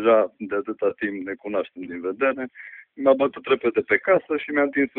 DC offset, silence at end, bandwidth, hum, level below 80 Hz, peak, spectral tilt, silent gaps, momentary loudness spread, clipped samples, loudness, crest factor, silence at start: under 0.1%; 0.1 s; 4.1 kHz; none; -66 dBFS; -4 dBFS; -9.5 dB/octave; none; 12 LU; under 0.1%; -23 LUFS; 18 dB; 0 s